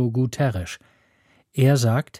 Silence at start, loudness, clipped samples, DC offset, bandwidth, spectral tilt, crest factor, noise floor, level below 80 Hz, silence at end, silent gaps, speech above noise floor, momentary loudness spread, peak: 0 s; -22 LUFS; under 0.1%; under 0.1%; 15 kHz; -6.5 dB/octave; 16 dB; -61 dBFS; -52 dBFS; 0 s; none; 40 dB; 16 LU; -6 dBFS